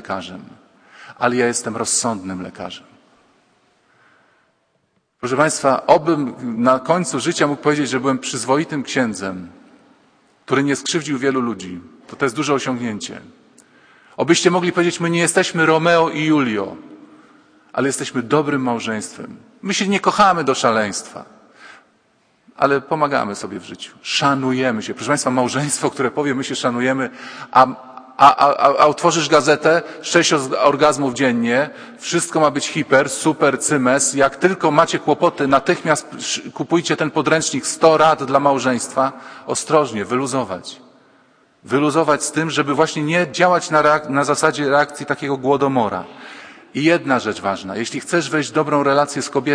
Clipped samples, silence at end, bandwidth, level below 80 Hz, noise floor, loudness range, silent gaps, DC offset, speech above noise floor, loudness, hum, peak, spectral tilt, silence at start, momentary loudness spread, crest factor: under 0.1%; 0 s; 10.5 kHz; -62 dBFS; -65 dBFS; 7 LU; none; under 0.1%; 48 dB; -17 LUFS; none; 0 dBFS; -4 dB/octave; 0.05 s; 14 LU; 18 dB